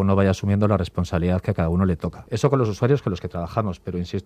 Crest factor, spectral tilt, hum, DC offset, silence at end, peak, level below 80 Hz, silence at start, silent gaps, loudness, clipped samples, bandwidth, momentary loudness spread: 18 dB; -8 dB/octave; none; under 0.1%; 0.05 s; -4 dBFS; -46 dBFS; 0 s; none; -23 LUFS; under 0.1%; 9.6 kHz; 8 LU